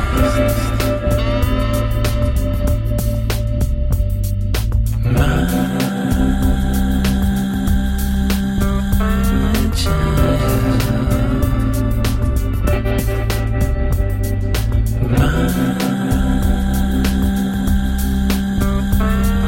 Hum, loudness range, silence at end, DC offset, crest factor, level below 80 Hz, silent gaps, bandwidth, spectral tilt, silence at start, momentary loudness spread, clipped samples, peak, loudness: none; 2 LU; 0 s; 0.3%; 12 dB; -18 dBFS; none; 17 kHz; -6.5 dB/octave; 0 s; 3 LU; under 0.1%; -4 dBFS; -18 LUFS